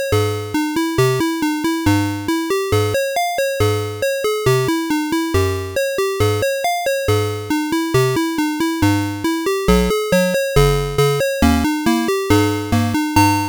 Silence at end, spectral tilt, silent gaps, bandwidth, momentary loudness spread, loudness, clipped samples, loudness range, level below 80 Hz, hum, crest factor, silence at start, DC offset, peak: 0 s; -5.5 dB/octave; none; over 20 kHz; 4 LU; -17 LUFS; under 0.1%; 2 LU; -32 dBFS; none; 12 dB; 0 s; under 0.1%; -4 dBFS